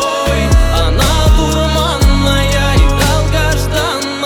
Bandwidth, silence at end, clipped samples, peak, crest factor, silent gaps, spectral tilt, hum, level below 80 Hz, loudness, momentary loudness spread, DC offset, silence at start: 18.5 kHz; 0 s; under 0.1%; 0 dBFS; 10 dB; none; -4.5 dB/octave; none; -14 dBFS; -12 LUFS; 3 LU; under 0.1%; 0 s